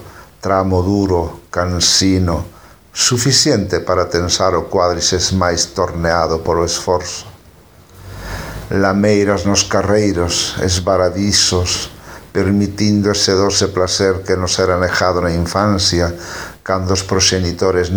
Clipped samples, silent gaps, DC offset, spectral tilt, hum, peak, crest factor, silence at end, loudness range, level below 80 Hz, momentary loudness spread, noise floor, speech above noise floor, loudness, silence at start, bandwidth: under 0.1%; none; under 0.1%; -4 dB/octave; none; 0 dBFS; 16 dB; 0 s; 3 LU; -36 dBFS; 11 LU; -44 dBFS; 29 dB; -14 LUFS; 0 s; over 20 kHz